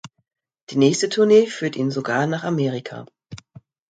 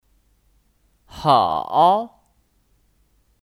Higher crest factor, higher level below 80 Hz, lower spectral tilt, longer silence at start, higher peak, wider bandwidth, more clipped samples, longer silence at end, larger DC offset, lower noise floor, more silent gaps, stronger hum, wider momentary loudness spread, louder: about the same, 18 dB vs 22 dB; second, -64 dBFS vs -56 dBFS; about the same, -5.5 dB/octave vs -6 dB/octave; second, 0.05 s vs 1.15 s; about the same, -2 dBFS vs -2 dBFS; second, 9.2 kHz vs 13.5 kHz; neither; second, 0.55 s vs 1.4 s; neither; second, -47 dBFS vs -63 dBFS; first, 0.62-0.67 s vs none; neither; first, 24 LU vs 8 LU; about the same, -20 LUFS vs -18 LUFS